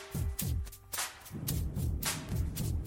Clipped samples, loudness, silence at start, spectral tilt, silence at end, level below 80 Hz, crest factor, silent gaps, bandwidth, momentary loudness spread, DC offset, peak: under 0.1%; -36 LUFS; 0 s; -4 dB/octave; 0 s; -40 dBFS; 16 dB; none; 17 kHz; 5 LU; under 0.1%; -18 dBFS